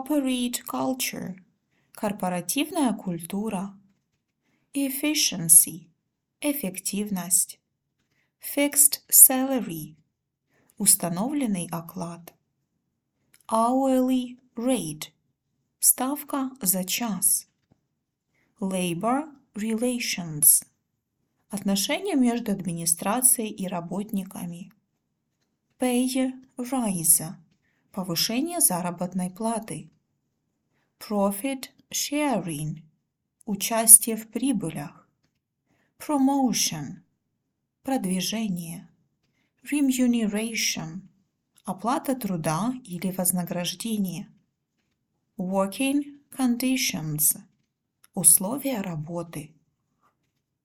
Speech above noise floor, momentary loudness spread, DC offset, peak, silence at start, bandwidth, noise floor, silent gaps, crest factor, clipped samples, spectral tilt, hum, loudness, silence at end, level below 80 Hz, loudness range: 54 dB; 19 LU; under 0.1%; 0 dBFS; 0 s; 19 kHz; -79 dBFS; none; 26 dB; under 0.1%; -3 dB/octave; none; -23 LUFS; 1.2 s; -66 dBFS; 9 LU